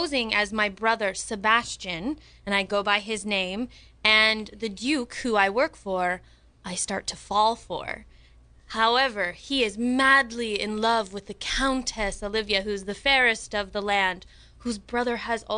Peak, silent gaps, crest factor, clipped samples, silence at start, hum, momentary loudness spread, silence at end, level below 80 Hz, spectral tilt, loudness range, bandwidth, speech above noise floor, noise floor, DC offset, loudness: -4 dBFS; none; 22 dB; under 0.1%; 0 s; none; 14 LU; 0 s; -48 dBFS; -2.5 dB/octave; 3 LU; 10.5 kHz; 28 dB; -53 dBFS; under 0.1%; -25 LUFS